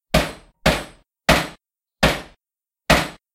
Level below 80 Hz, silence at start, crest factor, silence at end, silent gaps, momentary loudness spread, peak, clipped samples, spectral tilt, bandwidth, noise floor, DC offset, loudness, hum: -32 dBFS; 0.15 s; 20 dB; 0.2 s; none; 13 LU; -2 dBFS; under 0.1%; -4 dB/octave; 16.5 kHz; -90 dBFS; under 0.1%; -20 LUFS; none